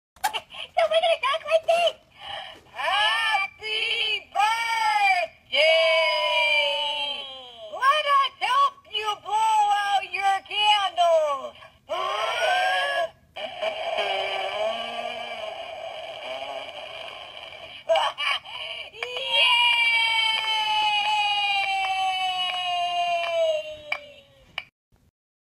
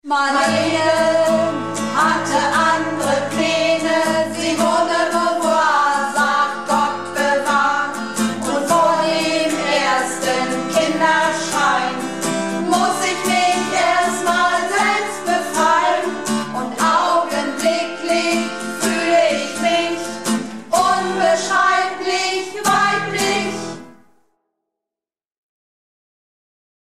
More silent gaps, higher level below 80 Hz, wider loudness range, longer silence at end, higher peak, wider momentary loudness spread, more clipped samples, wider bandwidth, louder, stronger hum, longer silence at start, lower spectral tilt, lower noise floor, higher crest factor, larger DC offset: neither; second, -68 dBFS vs -60 dBFS; first, 8 LU vs 2 LU; second, 0.8 s vs 2.95 s; second, -8 dBFS vs -4 dBFS; first, 16 LU vs 6 LU; neither; about the same, 15.5 kHz vs 15 kHz; second, -23 LUFS vs -17 LUFS; neither; first, 0.25 s vs 0.05 s; second, 0.5 dB/octave vs -3 dB/octave; second, -51 dBFS vs under -90 dBFS; about the same, 18 dB vs 14 dB; second, under 0.1% vs 0.6%